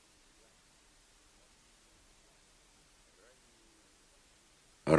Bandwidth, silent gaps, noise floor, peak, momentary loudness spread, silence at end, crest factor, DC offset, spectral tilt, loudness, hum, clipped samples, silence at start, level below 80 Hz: 11 kHz; none; -65 dBFS; -10 dBFS; 1 LU; 0 s; 30 dB; under 0.1%; -6.5 dB/octave; -58 LUFS; none; under 0.1%; 4.85 s; -66 dBFS